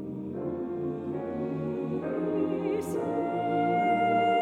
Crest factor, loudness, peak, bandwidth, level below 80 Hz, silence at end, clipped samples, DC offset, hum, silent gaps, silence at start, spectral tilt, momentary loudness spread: 14 dB; -30 LUFS; -16 dBFS; 14.5 kHz; -64 dBFS; 0 s; under 0.1%; under 0.1%; none; none; 0 s; -7.5 dB/octave; 9 LU